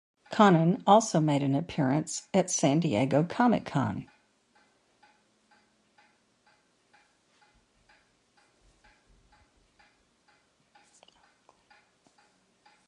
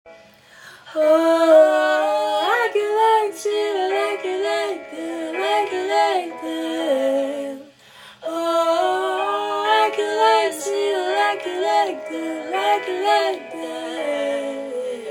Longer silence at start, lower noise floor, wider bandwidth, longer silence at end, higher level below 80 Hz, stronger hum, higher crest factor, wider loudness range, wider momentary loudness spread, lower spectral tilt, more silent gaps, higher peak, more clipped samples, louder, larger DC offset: first, 0.3 s vs 0.05 s; first, -68 dBFS vs -47 dBFS; second, 11.5 kHz vs 17 kHz; first, 8.85 s vs 0 s; first, -66 dBFS vs -76 dBFS; neither; first, 24 dB vs 18 dB; first, 12 LU vs 5 LU; second, 9 LU vs 12 LU; first, -5.5 dB/octave vs -2 dB/octave; neither; about the same, -6 dBFS vs -4 dBFS; neither; second, -26 LUFS vs -20 LUFS; neither